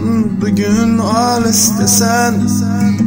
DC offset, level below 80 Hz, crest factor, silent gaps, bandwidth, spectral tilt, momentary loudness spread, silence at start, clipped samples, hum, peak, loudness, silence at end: under 0.1%; -40 dBFS; 12 dB; none; 16.5 kHz; -4 dB/octave; 5 LU; 0 s; under 0.1%; none; 0 dBFS; -12 LUFS; 0 s